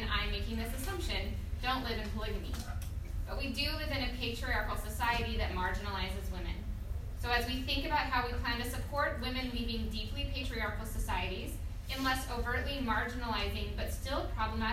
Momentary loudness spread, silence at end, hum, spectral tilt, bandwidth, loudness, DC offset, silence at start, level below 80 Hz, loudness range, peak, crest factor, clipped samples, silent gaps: 8 LU; 0 s; none; -4.5 dB/octave; 16 kHz; -36 LUFS; under 0.1%; 0 s; -40 dBFS; 2 LU; -18 dBFS; 16 dB; under 0.1%; none